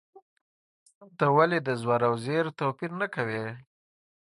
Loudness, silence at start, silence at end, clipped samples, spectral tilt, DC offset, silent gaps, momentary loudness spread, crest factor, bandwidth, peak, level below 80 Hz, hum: -27 LUFS; 1 s; 0.6 s; under 0.1%; -7 dB/octave; under 0.1%; none; 10 LU; 22 dB; 11.5 kHz; -8 dBFS; -72 dBFS; none